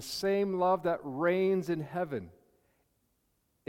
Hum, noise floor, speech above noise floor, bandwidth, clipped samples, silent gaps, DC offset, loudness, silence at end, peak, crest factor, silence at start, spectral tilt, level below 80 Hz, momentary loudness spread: none; -76 dBFS; 45 dB; 16.5 kHz; under 0.1%; none; under 0.1%; -31 LUFS; 1.4 s; -16 dBFS; 16 dB; 0 s; -6 dB/octave; -70 dBFS; 7 LU